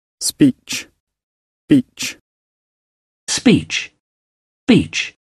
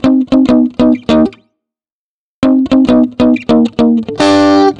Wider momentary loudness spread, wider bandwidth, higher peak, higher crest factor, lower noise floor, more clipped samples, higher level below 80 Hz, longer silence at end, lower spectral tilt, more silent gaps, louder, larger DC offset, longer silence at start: first, 11 LU vs 4 LU; first, 13.5 kHz vs 9.8 kHz; about the same, 0 dBFS vs 0 dBFS; first, 20 dB vs 10 dB; about the same, under -90 dBFS vs under -90 dBFS; neither; second, -50 dBFS vs -40 dBFS; about the same, 0.15 s vs 0.05 s; second, -4 dB/octave vs -6 dB/octave; first, 1.00-1.07 s, 1.23-1.68 s, 2.21-3.27 s, 4.00-4.67 s vs 1.92-2.42 s; second, -17 LUFS vs -10 LUFS; second, under 0.1% vs 0.4%; first, 0.2 s vs 0 s